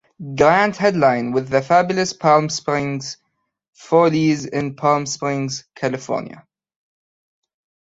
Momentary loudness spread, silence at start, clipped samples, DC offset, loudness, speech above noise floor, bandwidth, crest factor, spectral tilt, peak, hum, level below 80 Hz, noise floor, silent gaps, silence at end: 11 LU; 0.2 s; under 0.1%; under 0.1%; -18 LUFS; 54 dB; 8 kHz; 18 dB; -5 dB/octave; -2 dBFS; none; -56 dBFS; -72 dBFS; 3.68-3.73 s; 1.4 s